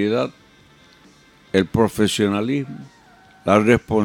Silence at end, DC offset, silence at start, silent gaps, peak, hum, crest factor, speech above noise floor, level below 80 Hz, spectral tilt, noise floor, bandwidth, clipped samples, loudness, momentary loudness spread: 0 s; under 0.1%; 0 s; none; -2 dBFS; none; 18 dB; 32 dB; -48 dBFS; -5.5 dB/octave; -51 dBFS; 17.5 kHz; under 0.1%; -19 LUFS; 13 LU